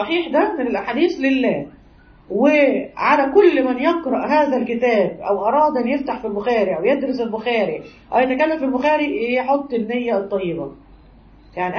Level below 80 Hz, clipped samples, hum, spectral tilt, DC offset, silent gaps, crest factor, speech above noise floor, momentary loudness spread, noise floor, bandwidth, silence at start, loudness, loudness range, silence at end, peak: -52 dBFS; under 0.1%; none; -6.5 dB/octave; under 0.1%; none; 16 dB; 29 dB; 9 LU; -47 dBFS; 6.6 kHz; 0 s; -18 LUFS; 3 LU; 0 s; -2 dBFS